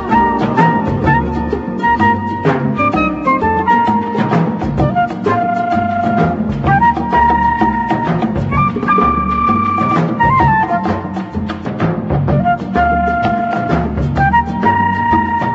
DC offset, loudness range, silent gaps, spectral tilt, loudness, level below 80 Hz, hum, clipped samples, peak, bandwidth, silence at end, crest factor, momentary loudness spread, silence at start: under 0.1%; 2 LU; none; -8.5 dB/octave; -14 LUFS; -30 dBFS; none; under 0.1%; 0 dBFS; 7.8 kHz; 0 s; 14 dB; 5 LU; 0 s